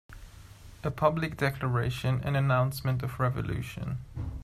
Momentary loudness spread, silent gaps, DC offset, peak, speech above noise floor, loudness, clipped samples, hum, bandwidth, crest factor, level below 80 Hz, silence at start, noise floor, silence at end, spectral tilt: 10 LU; none; under 0.1%; -10 dBFS; 20 dB; -30 LUFS; under 0.1%; none; 15 kHz; 20 dB; -48 dBFS; 0.1 s; -49 dBFS; 0 s; -7 dB/octave